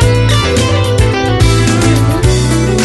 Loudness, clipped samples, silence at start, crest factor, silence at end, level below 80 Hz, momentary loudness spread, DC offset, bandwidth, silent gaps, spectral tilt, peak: -10 LUFS; under 0.1%; 0 s; 10 dB; 0 s; -18 dBFS; 2 LU; under 0.1%; 12.5 kHz; none; -5.5 dB/octave; 0 dBFS